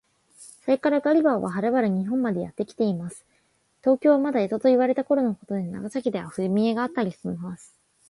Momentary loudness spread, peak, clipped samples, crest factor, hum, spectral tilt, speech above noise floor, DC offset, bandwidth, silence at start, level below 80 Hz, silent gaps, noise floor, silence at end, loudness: 12 LU; -8 dBFS; under 0.1%; 16 dB; none; -7.5 dB/octave; 44 dB; under 0.1%; 11.5 kHz; 0.4 s; -66 dBFS; none; -67 dBFS; 0.55 s; -24 LUFS